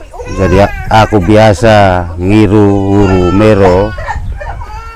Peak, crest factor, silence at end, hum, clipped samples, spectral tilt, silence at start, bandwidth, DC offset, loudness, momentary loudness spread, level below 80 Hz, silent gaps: 0 dBFS; 8 dB; 0 s; none; 2%; -7 dB/octave; 0 s; 12.5 kHz; under 0.1%; -7 LUFS; 15 LU; -22 dBFS; none